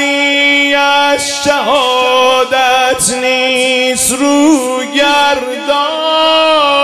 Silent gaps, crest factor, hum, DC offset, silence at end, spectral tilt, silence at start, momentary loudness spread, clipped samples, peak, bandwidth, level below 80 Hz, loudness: none; 10 dB; none; under 0.1%; 0 s; -1 dB/octave; 0 s; 4 LU; under 0.1%; 0 dBFS; 16 kHz; -48 dBFS; -10 LUFS